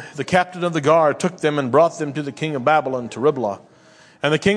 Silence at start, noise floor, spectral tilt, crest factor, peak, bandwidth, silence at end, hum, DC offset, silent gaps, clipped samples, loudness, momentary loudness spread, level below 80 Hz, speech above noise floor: 0 s; -49 dBFS; -5.5 dB/octave; 18 dB; -2 dBFS; 10.5 kHz; 0 s; none; under 0.1%; none; under 0.1%; -19 LUFS; 10 LU; -58 dBFS; 31 dB